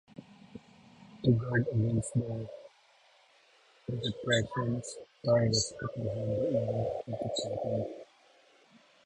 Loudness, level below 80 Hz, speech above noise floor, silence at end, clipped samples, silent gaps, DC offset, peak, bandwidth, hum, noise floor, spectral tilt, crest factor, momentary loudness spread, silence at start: -32 LUFS; -58 dBFS; 33 dB; 1 s; under 0.1%; none; under 0.1%; -14 dBFS; 11 kHz; none; -64 dBFS; -5.5 dB/octave; 20 dB; 22 LU; 0.2 s